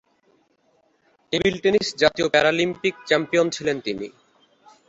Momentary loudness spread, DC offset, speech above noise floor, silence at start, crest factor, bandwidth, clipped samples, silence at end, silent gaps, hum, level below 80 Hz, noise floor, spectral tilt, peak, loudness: 9 LU; under 0.1%; 43 dB; 1.3 s; 20 dB; 8.2 kHz; under 0.1%; 0.8 s; none; none; -56 dBFS; -64 dBFS; -4 dB/octave; -2 dBFS; -21 LUFS